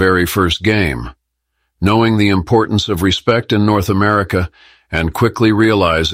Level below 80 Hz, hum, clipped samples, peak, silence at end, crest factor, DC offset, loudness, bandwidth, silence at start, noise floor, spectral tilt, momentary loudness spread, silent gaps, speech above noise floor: -34 dBFS; none; under 0.1%; 0 dBFS; 0 s; 14 dB; under 0.1%; -14 LUFS; 16 kHz; 0 s; -70 dBFS; -6 dB/octave; 7 LU; none; 56 dB